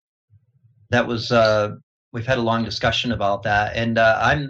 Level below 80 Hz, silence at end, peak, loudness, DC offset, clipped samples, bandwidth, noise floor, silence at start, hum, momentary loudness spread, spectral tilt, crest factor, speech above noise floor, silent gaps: -44 dBFS; 0 s; -4 dBFS; -20 LUFS; under 0.1%; under 0.1%; 8 kHz; -57 dBFS; 0.9 s; none; 7 LU; -5.5 dB/octave; 18 dB; 38 dB; 1.83-2.12 s